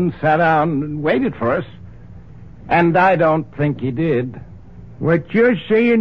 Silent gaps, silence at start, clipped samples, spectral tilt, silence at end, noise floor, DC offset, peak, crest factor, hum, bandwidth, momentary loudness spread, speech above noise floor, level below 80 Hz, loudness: none; 0 s; under 0.1%; -9.5 dB/octave; 0 s; -39 dBFS; 0.7%; -2 dBFS; 16 dB; none; 6.2 kHz; 9 LU; 23 dB; -46 dBFS; -17 LUFS